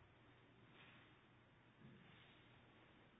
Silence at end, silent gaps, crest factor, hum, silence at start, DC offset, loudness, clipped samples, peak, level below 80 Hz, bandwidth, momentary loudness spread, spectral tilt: 0 s; none; 16 dB; none; 0 s; under 0.1%; -67 LUFS; under 0.1%; -52 dBFS; -84 dBFS; 3.8 kHz; 4 LU; -3.5 dB/octave